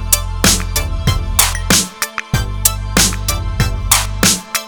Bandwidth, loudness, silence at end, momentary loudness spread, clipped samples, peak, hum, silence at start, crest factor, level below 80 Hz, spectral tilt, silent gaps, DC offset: over 20 kHz; -14 LUFS; 0 s; 7 LU; under 0.1%; 0 dBFS; none; 0 s; 16 dB; -22 dBFS; -2.5 dB/octave; none; under 0.1%